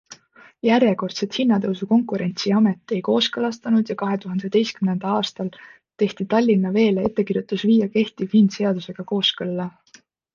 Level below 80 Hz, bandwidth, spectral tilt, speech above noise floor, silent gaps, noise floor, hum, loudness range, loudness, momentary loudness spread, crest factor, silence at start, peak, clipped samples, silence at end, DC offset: -62 dBFS; 7.2 kHz; -6 dB/octave; 33 dB; none; -53 dBFS; none; 3 LU; -21 LUFS; 8 LU; 16 dB; 0.1 s; -4 dBFS; under 0.1%; 0.65 s; under 0.1%